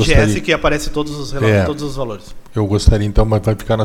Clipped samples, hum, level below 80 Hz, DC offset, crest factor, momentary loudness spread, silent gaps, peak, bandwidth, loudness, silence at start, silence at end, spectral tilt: under 0.1%; none; -22 dBFS; under 0.1%; 14 dB; 11 LU; none; 0 dBFS; 14.5 kHz; -17 LUFS; 0 s; 0 s; -6 dB/octave